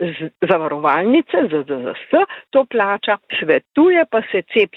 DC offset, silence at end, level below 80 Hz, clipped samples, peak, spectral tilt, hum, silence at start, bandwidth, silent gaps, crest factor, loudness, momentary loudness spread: under 0.1%; 0 s; -64 dBFS; under 0.1%; -2 dBFS; -8 dB/octave; none; 0 s; 4.2 kHz; none; 14 dB; -17 LUFS; 7 LU